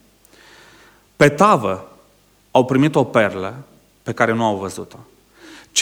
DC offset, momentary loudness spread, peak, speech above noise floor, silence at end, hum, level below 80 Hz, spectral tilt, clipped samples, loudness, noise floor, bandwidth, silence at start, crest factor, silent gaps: under 0.1%; 18 LU; 0 dBFS; 38 dB; 0 s; 50 Hz at -50 dBFS; -56 dBFS; -4.5 dB/octave; under 0.1%; -17 LUFS; -55 dBFS; 19.5 kHz; 1.2 s; 20 dB; none